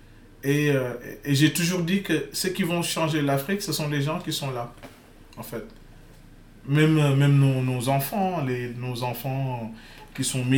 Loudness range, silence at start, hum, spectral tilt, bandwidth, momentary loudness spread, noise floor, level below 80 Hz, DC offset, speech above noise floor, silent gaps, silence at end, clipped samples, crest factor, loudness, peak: 5 LU; 0.1 s; none; -5.5 dB/octave; 19.5 kHz; 17 LU; -48 dBFS; -52 dBFS; under 0.1%; 24 dB; none; 0 s; under 0.1%; 18 dB; -24 LUFS; -8 dBFS